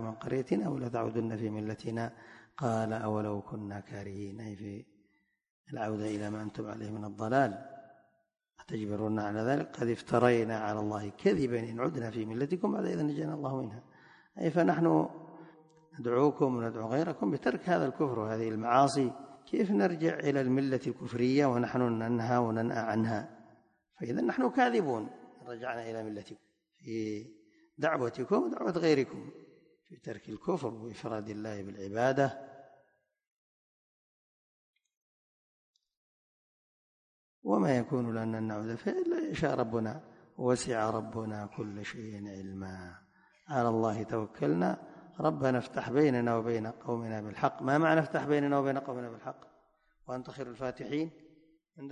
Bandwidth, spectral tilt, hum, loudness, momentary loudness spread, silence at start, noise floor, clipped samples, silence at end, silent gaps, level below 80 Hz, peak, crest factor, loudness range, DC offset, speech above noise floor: 10.5 kHz; -7 dB/octave; none; -33 LUFS; 15 LU; 0 s; -74 dBFS; under 0.1%; 0 s; 5.50-5.64 s, 33.27-34.73 s, 34.97-35.74 s, 35.97-37.42 s; -68 dBFS; -10 dBFS; 22 dB; 7 LU; under 0.1%; 42 dB